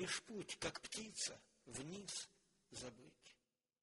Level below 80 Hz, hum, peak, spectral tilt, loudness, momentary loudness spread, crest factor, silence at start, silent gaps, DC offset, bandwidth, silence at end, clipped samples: -76 dBFS; none; -30 dBFS; -2 dB/octave; -48 LUFS; 19 LU; 20 dB; 0 s; none; under 0.1%; 11.5 kHz; 0.5 s; under 0.1%